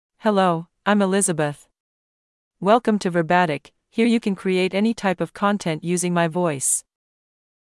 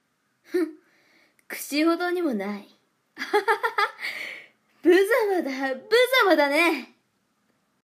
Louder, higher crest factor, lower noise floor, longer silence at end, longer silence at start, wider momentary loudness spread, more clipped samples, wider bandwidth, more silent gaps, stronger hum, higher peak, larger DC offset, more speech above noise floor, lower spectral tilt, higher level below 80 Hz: about the same, -21 LUFS vs -23 LUFS; about the same, 18 dB vs 18 dB; first, under -90 dBFS vs -71 dBFS; second, 0.85 s vs 1 s; second, 0.25 s vs 0.5 s; second, 6 LU vs 16 LU; neither; second, 12 kHz vs 15.5 kHz; first, 1.80-2.51 s vs none; neither; first, -4 dBFS vs -8 dBFS; neither; first, over 70 dB vs 49 dB; first, -4.5 dB/octave vs -3 dB/octave; first, -64 dBFS vs -84 dBFS